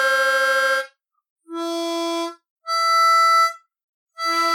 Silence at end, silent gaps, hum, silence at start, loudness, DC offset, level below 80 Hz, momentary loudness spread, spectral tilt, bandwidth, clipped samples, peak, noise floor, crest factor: 0 s; 1.30-1.36 s, 2.50-2.56 s, 3.84-4.07 s; none; 0 s; -19 LUFS; under 0.1%; under -90 dBFS; 16 LU; 2 dB/octave; 17.5 kHz; under 0.1%; -8 dBFS; -41 dBFS; 14 dB